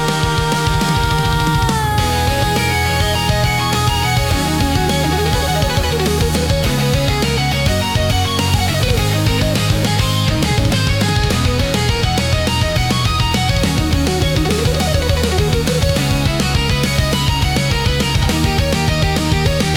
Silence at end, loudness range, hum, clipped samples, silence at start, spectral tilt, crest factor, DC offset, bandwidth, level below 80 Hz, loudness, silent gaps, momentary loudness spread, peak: 0 s; 0 LU; none; under 0.1%; 0 s; -4.5 dB/octave; 12 dB; under 0.1%; 18 kHz; -24 dBFS; -15 LUFS; none; 1 LU; -4 dBFS